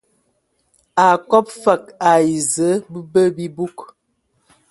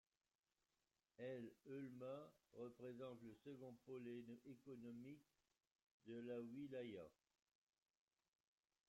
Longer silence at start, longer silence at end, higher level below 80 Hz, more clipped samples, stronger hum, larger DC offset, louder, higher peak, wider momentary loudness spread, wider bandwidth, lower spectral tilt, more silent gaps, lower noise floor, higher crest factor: second, 0.95 s vs 1.2 s; second, 0.85 s vs 1.75 s; first, -62 dBFS vs under -90 dBFS; neither; neither; neither; first, -17 LUFS vs -57 LUFS; first, 0 dBFS vs -42 dBFS; first, 11 LU vs 7 LU; second, 12 kHz vs 16 kHz; second, -4.5 dB/octave vs -7.5 dB/octave; second, none vs 5.72-5.76 s, 5.83-6.00 s; second, -67 dBFS vs under -90 dBFS; about the same, 18 dB vs 16 dB